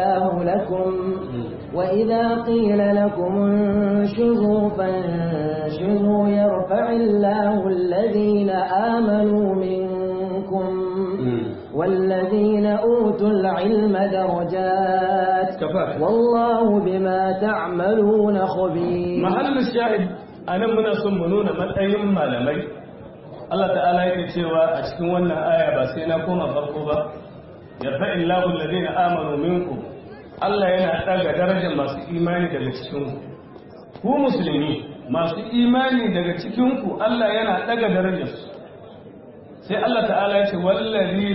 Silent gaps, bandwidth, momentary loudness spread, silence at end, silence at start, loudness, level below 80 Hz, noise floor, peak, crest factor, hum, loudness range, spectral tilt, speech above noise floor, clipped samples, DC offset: none; 5.8 kHz; 9 LU; 0 s; 0 s; -21 LUFS; -52 dBFS; -41 dBFS; -8 dBFS; 12 dB; none; 4 LU; -11.5 dB/octave; 22 dB; under 0.1%; under 0.1%